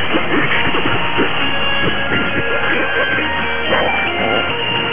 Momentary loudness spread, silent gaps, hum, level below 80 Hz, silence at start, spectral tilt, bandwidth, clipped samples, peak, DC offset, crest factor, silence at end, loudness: 2 LU; none; none; -38 dBFS; 0 s; -8 dB/octave; 3.7 kHz; under 0.1%; 0 dBFS; 9%; 16 dB; 0 s; -15 LUFS